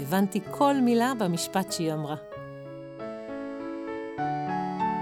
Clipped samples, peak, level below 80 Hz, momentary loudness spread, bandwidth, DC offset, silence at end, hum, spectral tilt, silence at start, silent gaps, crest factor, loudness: under 0.1%; -10 dBFS; -66 dBFS; 17 LU; 17.5 kHz; under 0.1%; 0 s; none; -5.5 dB/octave; 0 s; none; 18 dB; -28 LUFS